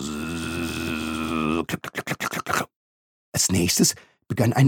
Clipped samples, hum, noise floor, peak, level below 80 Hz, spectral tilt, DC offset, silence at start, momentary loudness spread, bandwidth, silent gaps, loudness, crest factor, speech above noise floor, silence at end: under 0.1%; none; under -90 dBFS; -6 dBFS; -48 dBFS; -4 dB/octave; under 0.1%; 0 s; 10 LU; 19 kHz; 2.76-3.32 s; -24 LUFS; 18 dB; over 70 dB; 0 s